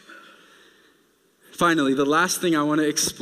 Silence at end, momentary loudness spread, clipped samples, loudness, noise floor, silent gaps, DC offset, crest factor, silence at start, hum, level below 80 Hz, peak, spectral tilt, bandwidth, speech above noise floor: 0 s; 3 LU; under 0.1%; -21 LUFS; -62 dBFS; none; under 0.1%; 16 dB; 0.1 s; none; -62 dBFS; -8 dBFS; -3.5 dB/octave; 16 kHz; 41 dB